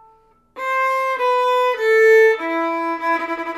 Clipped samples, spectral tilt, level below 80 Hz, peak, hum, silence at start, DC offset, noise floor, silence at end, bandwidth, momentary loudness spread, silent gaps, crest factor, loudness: under 0.1%; -2 dB/octave; -64 dBFS; -4 dBFS; none; 0.55 s; under 0.1%; -54 dBFS; 0 s; 14.5 kHz; 10 LU; none; 14 dB; -17 LUFS